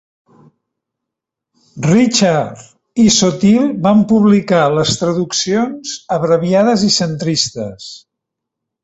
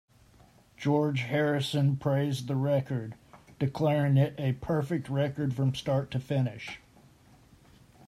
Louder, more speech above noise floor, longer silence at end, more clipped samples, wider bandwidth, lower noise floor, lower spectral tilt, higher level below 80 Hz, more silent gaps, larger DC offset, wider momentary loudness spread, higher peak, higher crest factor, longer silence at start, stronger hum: first, -13 LUFS vs -29 LUFS; first, 68 dB vs 31 dB; second, 0.85 s vs 1.3 s; neither; second, 8.2 kHz vs 13 kHz; first, -81 dBFS vs -59 dBFS; second, -4.5 dB/octave vs -7.5 dB/octave; first, -50 dBFS vs -60 dBFS; neither; neither; first, 13 LU vs 8 LU; first, 0 dBFS vs -14 dBFS; about the same, 14 dB vs 16 dB; first, 1.75 s vs 0.8 s; neither